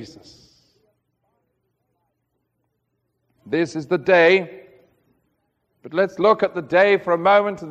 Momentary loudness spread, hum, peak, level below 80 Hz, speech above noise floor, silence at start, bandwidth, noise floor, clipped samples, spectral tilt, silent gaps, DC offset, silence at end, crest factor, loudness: 9 LU; none; -2 dBFS; -66 dBFS; 55 dB; 0 s; 8.6 kHz; -73 dBFS; under 0.1%; -6 dB/octave; none; under 0.1%; 0 s; 20 dB; -18 LUFS